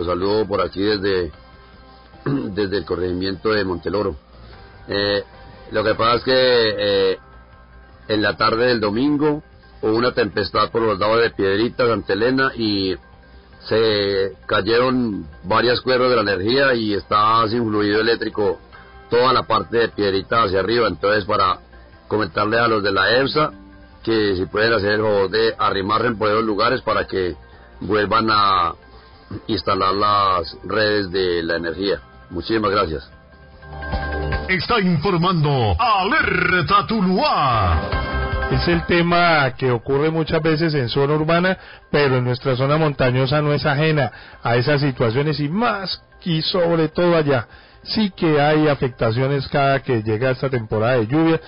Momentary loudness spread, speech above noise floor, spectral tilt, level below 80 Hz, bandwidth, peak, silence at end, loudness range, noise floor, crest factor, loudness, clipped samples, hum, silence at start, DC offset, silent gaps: 8 LU; 26 dB; -10.5 dB/octave; -38 dBFS; 5.4 kHz; -4 dBFS; 0 s; 4 LU; -44 dBFS; 14 dB; -19 LUFS; under 0.1%; none; 0 s; under 0.1%; none